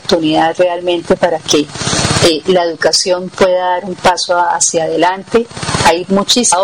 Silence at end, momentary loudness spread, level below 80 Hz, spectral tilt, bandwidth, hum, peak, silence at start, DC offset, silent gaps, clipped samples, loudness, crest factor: 0 s; 5 LU; -40 dBFS; -3 dB/octave; 17 kHz; none; -2 dBFS; 0.05 s; 0.2%; none; under 0.1%; -12 LUFS; 10 dB